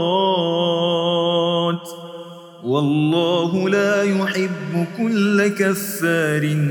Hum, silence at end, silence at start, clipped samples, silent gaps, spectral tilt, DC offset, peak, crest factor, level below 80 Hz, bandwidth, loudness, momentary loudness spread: none; 0 s; 0 s; under 0.1%; none; -5.5 dB/octave; under 0.1%; -6 dBFS; 14 dB; -76 dBFS; over 20 kHz; -19 LUFS; 10 LU